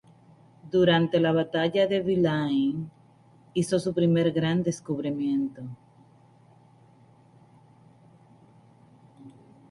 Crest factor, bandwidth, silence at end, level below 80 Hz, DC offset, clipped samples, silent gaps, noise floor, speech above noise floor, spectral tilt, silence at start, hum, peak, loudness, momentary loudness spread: 20 dB; 11.5 kHz; 0.4 s; -62 dBFS; under 0.1%; under 0.1%; none; -57 dBFS; 32 dB; -6.5 dB/octave; 0.65 s; none; -8 dBFS; -25 LUFS; 11 LU